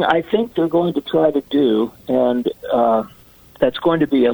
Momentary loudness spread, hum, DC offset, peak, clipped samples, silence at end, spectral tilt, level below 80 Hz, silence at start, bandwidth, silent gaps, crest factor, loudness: 4 LU; none; under 0.1%; -2 dBFS; under 0.1%; 0 s; -7.5 dB/octave; -52 dBFS; 0 s; over 20 kHz; none; 16 dB; -18 LUFS